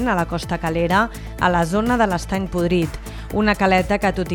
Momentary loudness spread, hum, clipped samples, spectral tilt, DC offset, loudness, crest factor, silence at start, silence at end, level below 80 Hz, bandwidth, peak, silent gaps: 7 LU; none; under 0.1%; -6 dB/octave; under 0.1%; -20 LUFS; 16 dB; 0 s; 0 s; -34 dBFS; 19 kHz; -4 dBFS; none